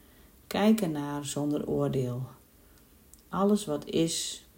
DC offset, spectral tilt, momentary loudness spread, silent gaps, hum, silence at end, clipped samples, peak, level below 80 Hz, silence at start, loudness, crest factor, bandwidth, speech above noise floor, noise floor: under 0.1%; -5 dB/octave; 10 LU; none; none; 0.15 s; under 0.1%; -14 dBFS; -60 dBFS; 0.5 s; -29 LUFS; 18 dB; 16.5 kHz; 29 dB; -58 dBFS